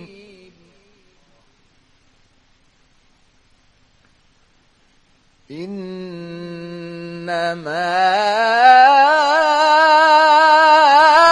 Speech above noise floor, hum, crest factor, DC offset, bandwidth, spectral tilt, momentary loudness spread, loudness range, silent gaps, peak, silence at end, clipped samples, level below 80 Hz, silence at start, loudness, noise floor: 41 dB; none; 16 dB; under 0.1%; 11.5 kHz; -3 dB/octave; 22 LU; 24 LU; none; 0 dBFS; 0 s; under 0.1%; -60 dBFS; 0 s; -12 LUFS; -56 dBFS